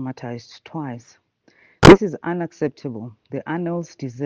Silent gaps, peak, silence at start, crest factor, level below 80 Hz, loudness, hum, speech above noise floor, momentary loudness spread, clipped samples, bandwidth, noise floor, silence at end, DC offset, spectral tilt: none; 0 dBFS; 0 s; 20 dB; -38 dBFS; -16 LUFS; none; 37 dB; 24 LU; under 0.1%; 10 kHz; -57 dBFS; 0 s; under 0.1%; -6 dB/octave